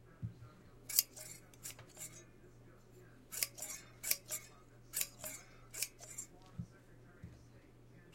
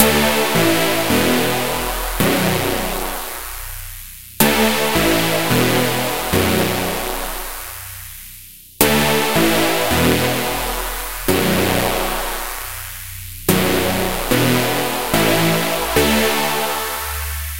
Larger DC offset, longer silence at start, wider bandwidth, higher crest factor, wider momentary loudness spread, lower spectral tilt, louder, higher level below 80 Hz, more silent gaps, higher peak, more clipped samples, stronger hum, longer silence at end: second, under 0.1% vs 2%; about the same, 0 s vs 0 s; about the same, 16.5 kHz vs 17 kHz; first, 38 dB vs 18 dB; first, 25 LU vs 13 LU; second, -1 dB/octave vs -3.5 dB/octave; second, -42 LUFS vs -17 LUFS; second, -66 dBFS vs -34 dBFS; neither; second, -8 dBFS vs 0 dBFS; neither; neither; about the same, 0 s vs 0 s